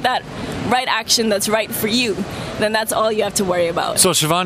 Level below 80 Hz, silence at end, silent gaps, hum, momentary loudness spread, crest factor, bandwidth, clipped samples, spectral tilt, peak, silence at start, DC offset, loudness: -46 dBFS; 0 s; none; none; 9 LU; 18 dB; 16.5 kHz; under 0.1%; -2.5 dB/octave; 0 dBFS; 0 s; under 0.1%; -17 LUFS